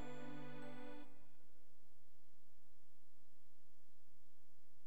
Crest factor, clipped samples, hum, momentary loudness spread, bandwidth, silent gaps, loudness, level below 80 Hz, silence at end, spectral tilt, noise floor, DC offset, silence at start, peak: 18 dB; under 0.1%; none; 7 LU; 18 kHz; none; -56 LUFS; -84 dBFS; 0 s; -6.5 dB/octave; -79 dBFS; 1%; 0 s; -36 dBFS